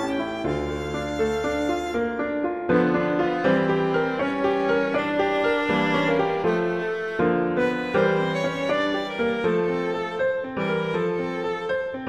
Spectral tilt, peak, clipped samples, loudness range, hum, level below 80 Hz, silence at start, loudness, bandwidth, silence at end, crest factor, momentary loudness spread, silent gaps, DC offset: -6.5 dB/octave; -8 dBFS; under 0.1%; 2 LU; none; -48 dBFS; 0 s; -24 LUFS; 12 kHz; 0 s; 16 dB; 5 LU; none; under 0.1%